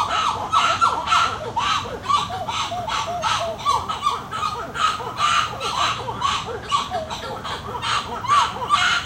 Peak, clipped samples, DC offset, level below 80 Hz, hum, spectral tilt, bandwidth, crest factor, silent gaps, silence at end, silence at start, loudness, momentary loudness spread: -6 dBFS; under 0.1%; under 0.1%; -46 dBFS; none; -2 dB/octave; 16 kHz; 16 dB; none; 0 s; 0 s; -21 LUFS; 7 LU